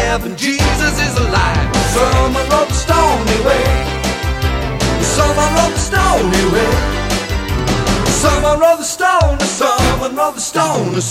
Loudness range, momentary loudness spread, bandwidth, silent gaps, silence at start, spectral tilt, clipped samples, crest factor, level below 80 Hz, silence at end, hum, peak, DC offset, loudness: 1 LU; 5 LU; 16.5 kHz; none; 0 s; -4 dB/octave; under 0.1%; 14 dB; -22 dBFS; 0 s; none; 0 dBFS; under 0.1%; -14 LUFS